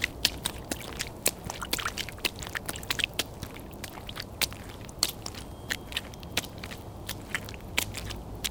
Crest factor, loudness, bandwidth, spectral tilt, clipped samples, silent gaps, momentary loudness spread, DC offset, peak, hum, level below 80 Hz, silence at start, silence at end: 34 dB; -33 LUFS; 19 kHz; -2 dB/octave; under 0.1%; none; 12 LU; under 0.1%; 0 dBFS; none; -48 dBFS; 0 s; 0 s